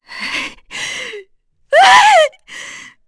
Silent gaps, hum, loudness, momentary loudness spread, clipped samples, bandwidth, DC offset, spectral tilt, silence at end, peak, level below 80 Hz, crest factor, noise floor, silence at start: none; none; -11 LUFS; 23 LU; under 0.1%; 11 kHz; under 0.1%; 0.5 dB/octave; 0.25 s; 0 dBFS; -54 dBFS; 14 dB; -52 dBFS; 0.1 s